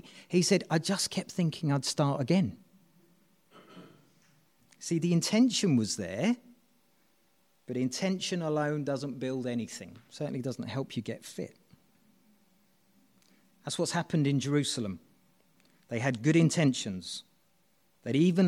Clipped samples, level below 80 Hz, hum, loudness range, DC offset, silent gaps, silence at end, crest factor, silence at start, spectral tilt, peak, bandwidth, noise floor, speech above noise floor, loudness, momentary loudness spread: under 0.1%; -74 dBFS; none; 9 LU; under 0.1%; none; 0 s; 20 dB; 0.05 s; -5 dB/octave; -12 dBFS; 15.5 kHz; -71 dBFS; 42 dB; -30 LUFS; 15 LU